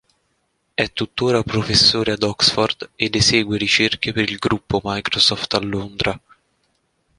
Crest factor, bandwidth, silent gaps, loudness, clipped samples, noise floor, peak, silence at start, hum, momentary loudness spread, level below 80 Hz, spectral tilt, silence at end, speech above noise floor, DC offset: 20 dB; 11.5 kHz; none; -18 LUFS; under 0.1%; -68 dBFS; 0 dBFS; 0.8 s; none; 9 LU; -44 dBFS; -3.5 dB/octave; 1 s; 49 dB; under 0.1%